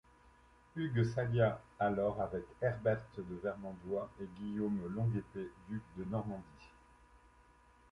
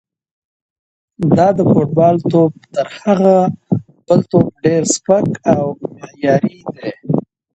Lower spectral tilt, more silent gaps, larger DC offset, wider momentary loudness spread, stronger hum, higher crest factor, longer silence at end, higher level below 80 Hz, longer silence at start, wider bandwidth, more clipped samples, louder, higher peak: first, -9 dB/octave vs -6.5 dB/octave; neither; neither; about the same, 12 LU vs 10 LU; neither; first, 20 dB vs 14 dB; first, 0.75 s vs 0.35 s; second, -62 dBFS vs -50 dBFS; second, 0.75 s vs 1.2 s; first, 10 kHz vs 8.8 kHz; neither; second, -38 LUFS vs -14 LUFS; second, -18 dBFS vs 0 dBFS